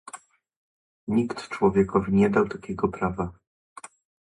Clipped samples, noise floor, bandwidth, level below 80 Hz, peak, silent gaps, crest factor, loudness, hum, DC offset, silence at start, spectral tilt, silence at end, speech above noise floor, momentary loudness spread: under 0.1%; -48 dBFS; 11.5 kHz; -50 dBFS; -8 dBFS; 0.56-1.07 s; 18 dB; -25 LUFS; none; under 0.1%; 0.15 s; -7.5 dB/octave; 0.95 s; 24 dB; 24 LU